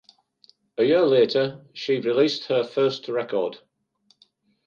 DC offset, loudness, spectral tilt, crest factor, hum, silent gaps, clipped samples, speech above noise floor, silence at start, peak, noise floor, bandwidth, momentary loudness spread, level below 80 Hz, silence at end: under 0.1%; -23 LUFS; -6 dB/octave; 16 dB; none; none; under 0.1%; 43 dB; 0.8 s; -8 dBFS; -65 dBFS; 7.2 kHz; 10 LU; -74 dBFS; 1.1 s